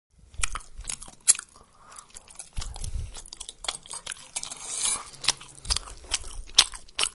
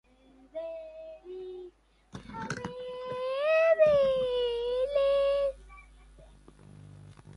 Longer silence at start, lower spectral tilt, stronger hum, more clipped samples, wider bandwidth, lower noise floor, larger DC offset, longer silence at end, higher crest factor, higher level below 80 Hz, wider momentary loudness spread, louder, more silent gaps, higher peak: second, 0.2 s vs 0.55 s; second, 0.5 dB/octave vs -5 dB/octave; neither; neither; first, 16 kHz vs 11.5 kHz; second, -53 dBFS vs -60 dBFS; neither; about the same, 0 s vs 0 s; first, 32 dB vs 18 dB; first, -42 dBFS vs -56 dBFS; second, 19 LU vs 22 LU; about the same, -27 LUFS vs -28 LUFS; neither; first, 0 dBFS vs -12 dBFS